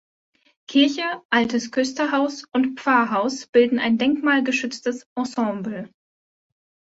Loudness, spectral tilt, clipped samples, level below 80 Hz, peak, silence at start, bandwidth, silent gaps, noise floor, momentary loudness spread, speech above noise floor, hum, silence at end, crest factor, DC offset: -21 LUFS; -4 dB/octave; under 0.1%; -66 dBFS; -4 dBFS; 0.7 s; 8 kHz; 1.25-1.29 s, 3.49-3.53 s, 5.06-5.16 s; under -90 dBFS; 9 LU; over 69 dB; none; 1.05 s; 20 dB; under 0.1%